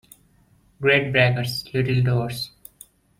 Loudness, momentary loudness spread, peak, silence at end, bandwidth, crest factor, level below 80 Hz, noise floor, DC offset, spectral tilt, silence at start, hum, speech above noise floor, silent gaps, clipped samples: -21 LUFS; 12 LU; -4 dBFS; 0.7 s; 16.5 kHz; 20 dB; -52 dBFS; -58 dBFS; under 0.1%; -6 dB/octave; 0.8 s; none; 38 dB; none; under 0.1%